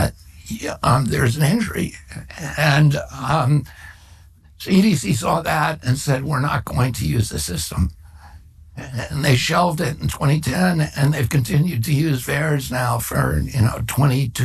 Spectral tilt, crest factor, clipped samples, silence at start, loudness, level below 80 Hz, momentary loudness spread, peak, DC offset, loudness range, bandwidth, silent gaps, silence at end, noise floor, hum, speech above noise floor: -5.5 dB/octave; 16 dB; under 0.1%; 0 s; -19 LUFS; -36 dBFS; 11 LU; -4 dBFS; under 0.1%; 3 LU; 13.5 kHz; none; 0 s; -46 dBFS; none; 28 dB